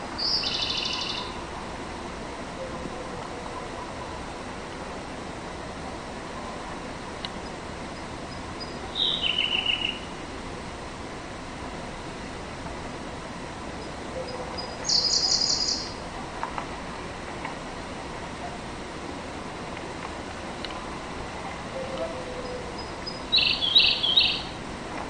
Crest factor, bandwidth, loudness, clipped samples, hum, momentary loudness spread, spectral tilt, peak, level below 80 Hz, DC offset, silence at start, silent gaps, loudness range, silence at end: 24 dB; 16 kHz; -28 LUFS; under 0.1%; none; 16 LU; -2 dB/octave; -8 dBFS; -46 dBFS; under 0.1%; 0 s; none; 11 LU; 0 s